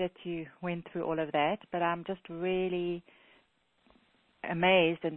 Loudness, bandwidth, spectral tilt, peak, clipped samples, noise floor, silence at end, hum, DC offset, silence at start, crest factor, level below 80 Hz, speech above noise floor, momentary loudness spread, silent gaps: -32 LUFS; 4.1 kHz; -9 dB/octave; -14 dBFS; under 0.1%; -70 dBFS; 0 s; none; under 0.1%; 0 s; 20 dB; -66 dBFS; 39 dB; 14 LU; none